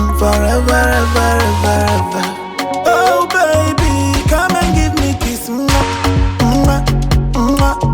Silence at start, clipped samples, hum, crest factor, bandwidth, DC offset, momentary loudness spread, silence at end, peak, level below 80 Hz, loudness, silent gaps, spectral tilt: 0 s; under 0.1%; none; 10 dB; over 20 kHz; under 0.1%; 5 LU; 0 s; -2 dBFS; -20 dBFS; -13 LUFS; none; -5 dB/octave